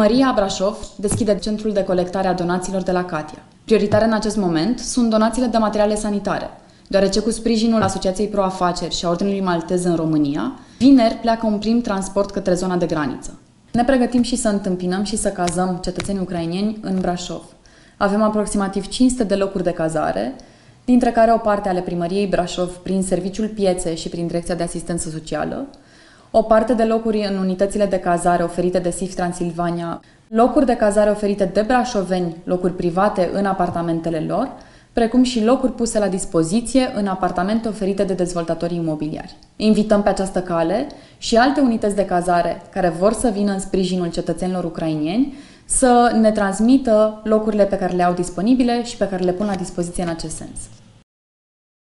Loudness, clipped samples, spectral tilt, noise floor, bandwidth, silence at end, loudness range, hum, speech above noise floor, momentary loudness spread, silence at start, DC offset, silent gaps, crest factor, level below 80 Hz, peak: -19 LUFS; under 0.1%; -5.5 dB/octave; -47 dBFS; 11.5 kHz; 1.15 s; 4 LU; none; 29 dB; 9 LU; 0 s; under 0.1%; none; 18 dB; -40 dBFS; 0 dBFS